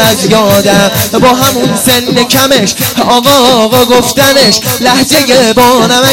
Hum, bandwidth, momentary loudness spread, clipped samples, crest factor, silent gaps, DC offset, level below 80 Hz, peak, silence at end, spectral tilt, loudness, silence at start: none; over 20 kHz; 3 LU; 2%; 6 dB; none; under 0.1%; -36 dBFS; 0 dBFS; 0 s; -3 dB/octave; -6 LUFS; 0 s